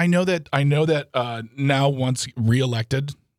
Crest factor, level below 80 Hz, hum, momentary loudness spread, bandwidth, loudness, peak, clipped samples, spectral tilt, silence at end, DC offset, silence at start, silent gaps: 16 dB; -58 dBFS; none; 7 LU; 14.5 kHz; -22 LUFS; -4 dBFS; under 0.1%; -6 dB/octave; 0.25 s; under 0.1%; 0 s; none